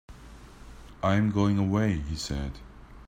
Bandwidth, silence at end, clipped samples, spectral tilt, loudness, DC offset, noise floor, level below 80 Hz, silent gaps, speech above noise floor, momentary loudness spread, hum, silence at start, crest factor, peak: 10 kHz; 0.05 s; under 0.1%; -6.5 dB/octave; -28 LUFS; under 0.1%; -48 dBFS; -44 dBFS; none; 22 dB; 15 LU; none; 0.1 s; 18 dB; -10 dBFS